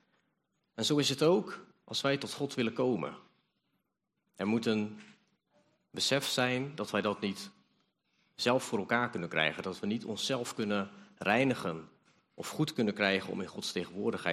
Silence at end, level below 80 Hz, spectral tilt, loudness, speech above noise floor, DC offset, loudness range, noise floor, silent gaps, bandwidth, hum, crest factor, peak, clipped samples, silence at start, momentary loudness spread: 0 s; -76 dBFS; -4 dB/octave; -32 LUFS; 51 dB; under 0.1%; 4 LU; -84 dBFS; none; 14.5 kHz; none; 22 dB; -12 dBFS; under 0.1%; 0.75 s; 13 LU